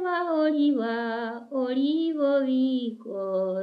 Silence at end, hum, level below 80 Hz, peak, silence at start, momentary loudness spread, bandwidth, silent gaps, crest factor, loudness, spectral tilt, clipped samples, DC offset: 0 s; none; -88 dBFS; -14 dBFS; 0 s; 8 LU; 5.2 kHz; none; 12 dB; -26 LUFS; -7.5 dB/octave; under 0.1%; under 0.1%